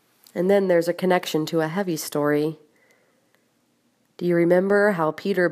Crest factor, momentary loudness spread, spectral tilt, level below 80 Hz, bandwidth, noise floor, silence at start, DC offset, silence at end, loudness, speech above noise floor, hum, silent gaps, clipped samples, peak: 16 dB; 8 LU; -6 dB/octave; -74 dBFS; 15.5 kHz; -66 dBFS; 0.35 s; under 0.1%; 0 s; -22 LUFS; 45 dB; none; none; under 0.1%; -6 dBFS